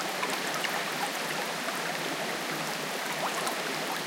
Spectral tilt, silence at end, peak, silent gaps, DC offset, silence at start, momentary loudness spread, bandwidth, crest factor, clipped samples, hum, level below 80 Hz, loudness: -2 dB/octave; 0 s; -14 dBFS; none; under 0.1%; 0 s; 2 LU; 17 kHz; 18 dB; under 0.1%; none; -86 dBFS; -31 LUFS